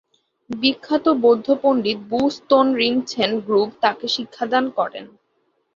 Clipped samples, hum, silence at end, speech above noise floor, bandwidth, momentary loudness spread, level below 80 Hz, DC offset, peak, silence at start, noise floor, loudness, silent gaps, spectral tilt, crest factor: under 0.1%; none; 0.7 s; 48 dB; 7.6 kHz; 7 LU; -62 dBFS; under 0.1%; -4 dBFS; 0.5 s; -68 dBFS; -19 LUFS; none; -4.5 dB/octave; 16 dB